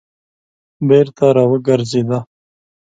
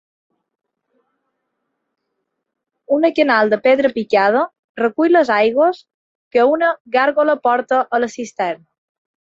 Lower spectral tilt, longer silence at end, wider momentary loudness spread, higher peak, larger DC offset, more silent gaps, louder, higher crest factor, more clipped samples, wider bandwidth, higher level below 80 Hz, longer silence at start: first, -7.5 dB/octave vs -5 dB/octave; about the same, 0.65 s vs 0.7 s; about the same, 10 LU vs 9 LU; about the same, 0 dBFS vs -2 dBFS; neither; second, none vs 4.59-4.75 s, 5.94-6.31 s, 6.80-6.85 s; about the same, -14 LUFS vs -16 LUFS; about the same, 16 dB vs 16 dB; neither; first, 9 kHz vs 7.8 kHz; first, -58 dBFS vs -66 dBFS; second, 0.8 s vs 2.9 s